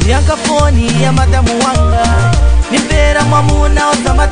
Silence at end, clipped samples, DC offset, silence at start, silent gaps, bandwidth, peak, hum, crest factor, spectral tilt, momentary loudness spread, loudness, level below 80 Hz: 0 s; under 0.1%; 4%; 0 s; none; 10 kHz; 0 dBFS; none; 10 dB; -5 dB/octave; 2 LU; -11 LUFS; -12 dBFS